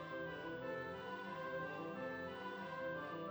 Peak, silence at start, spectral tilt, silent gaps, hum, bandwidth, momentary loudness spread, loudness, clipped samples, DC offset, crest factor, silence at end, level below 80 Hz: -34 dBFS; 0 s; -6.5 dB/octave; none; none; over 20 kHz; 2 LU; -46 LUFS; under 0.1%; under 0.1%; 12 dB; 0 s; -76 dBFS